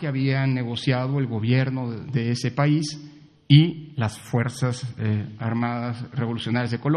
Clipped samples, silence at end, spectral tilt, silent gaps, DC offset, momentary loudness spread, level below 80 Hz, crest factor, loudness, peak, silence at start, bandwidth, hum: under 0.1%; 0 s; -6.5 dB/octave; none; under 0.1%; 10 LU; -60 dBFS; 22 dB; -24 LUFS; -2 dBFS; 0 s; 11.5 kHz; none